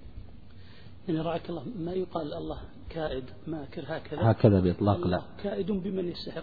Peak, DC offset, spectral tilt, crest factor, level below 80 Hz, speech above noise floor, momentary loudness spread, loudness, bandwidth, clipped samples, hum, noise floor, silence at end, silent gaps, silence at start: -6 dBFS; 0.5%; -10.5 dB/octave; 24 dB; -50 dBFS; 21 dB; 16 LU; -30 LUFS; 4.9 kHz; under 0.1%; none; -50 dBFS; 0 s; none; 0.05 s